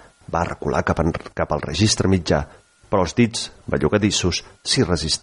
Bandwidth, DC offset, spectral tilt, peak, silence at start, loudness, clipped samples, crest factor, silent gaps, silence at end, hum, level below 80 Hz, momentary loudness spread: 11.5 kHz; under 0.1%; -4.5 dB/octave; -4 dBFS; 0.3 s; -21 LUFS; under 0.1%; 16 dB; none; 0.05 s; none; -38 dBFS; 7 LU